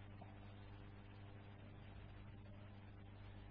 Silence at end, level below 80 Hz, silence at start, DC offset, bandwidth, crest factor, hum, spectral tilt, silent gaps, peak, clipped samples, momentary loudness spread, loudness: 0 s; -64 dBFS; 0 s; under 0.1%; 4.9 kHz; 12 dB; 50 Hz at -60 dBFS; -6 dB/octave; none; -46 dBFS; under 0.1%; 1 LU; -59 LUFS